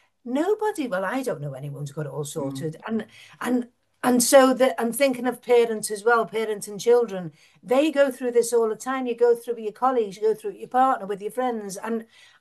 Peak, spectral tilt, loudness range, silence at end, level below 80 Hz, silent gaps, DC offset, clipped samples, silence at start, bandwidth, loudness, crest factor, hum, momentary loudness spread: -4 dBFS; -4 dB/octave; 7 LU; 0.35 s; -74 dBFS; none; under 0.1%; under 0.1%; 0.25 s; 12.5 kHz; -23 LUFS; 20 dB; none; 12 LU